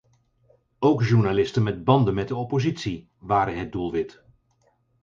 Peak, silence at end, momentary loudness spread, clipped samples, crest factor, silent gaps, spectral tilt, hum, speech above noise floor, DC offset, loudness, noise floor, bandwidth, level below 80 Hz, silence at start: -4 dBFS; 0.95 s; 10 LU; under 0.1%; 20 dB; none; -7.5 dB/octave; none; 44 dB; under 0.1%; -23 LUFS; -66 dBFS; 7.4 kHz; -50 dBFS; 0.8 s